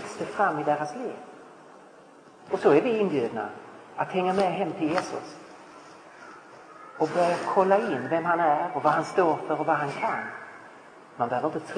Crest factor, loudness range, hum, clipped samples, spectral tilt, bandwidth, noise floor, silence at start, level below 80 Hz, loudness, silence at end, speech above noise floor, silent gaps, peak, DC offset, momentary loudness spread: 20 dB; 6 LU; none; under 0.1%; -6 dB/octave; 10.5 kHz; -51 dBFS; 0 s; -74 dBFS; -26 LUFS; 0 s; 26 dB; none; -8 dBFS; under 0.1%; 24 LU